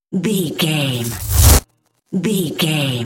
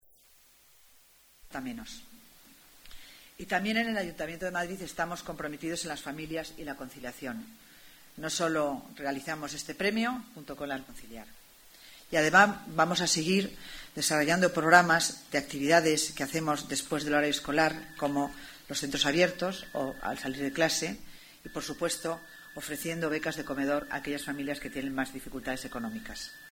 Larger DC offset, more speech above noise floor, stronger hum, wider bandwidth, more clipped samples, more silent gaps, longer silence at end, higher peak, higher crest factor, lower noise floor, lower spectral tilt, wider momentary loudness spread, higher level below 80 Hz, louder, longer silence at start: neither; first, 34 dB vs 30 dB; neither; second, 17 kHz vs over 20 kHz; neither; neither; about the same, 0 s vs 0 s; first, 0 dBFS vs -6 dBFS; second, 16 dB vs 26 dB; second, -53 dBFS vs -61 dBFS; about the same, -4 dB/octave vs -3.5 dB/octave; second, 10 LU vs 17 LU; first, -24 dBFS vs -58 dBFS; first, -16 LUFS vs -30 LUFS; second, 0.1 s vs 1.45 s